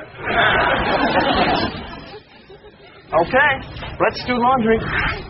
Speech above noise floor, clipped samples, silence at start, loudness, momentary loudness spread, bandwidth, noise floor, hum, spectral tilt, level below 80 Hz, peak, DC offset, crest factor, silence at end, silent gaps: 25 dB; under 0.1%; 0 s; -17 LUFS; 16 LU; 6 kHz; -43 dBFS; none; -2.5 dB/octave; -38 dBFS; -2 dBFS; under 0.1%; 16 dB; 0 s; none